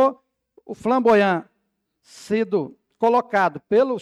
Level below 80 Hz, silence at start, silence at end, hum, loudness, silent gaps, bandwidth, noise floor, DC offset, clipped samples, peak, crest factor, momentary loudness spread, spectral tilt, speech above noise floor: -64 dBFS; 0 s; 0 s; none; -20 LUFS; none; 12 kHz; -74 dBFS; under 0.1%; under 0.1%; -8 dBFS; 14 dB; 11 LU; -6.5 dB/octave; 54 dB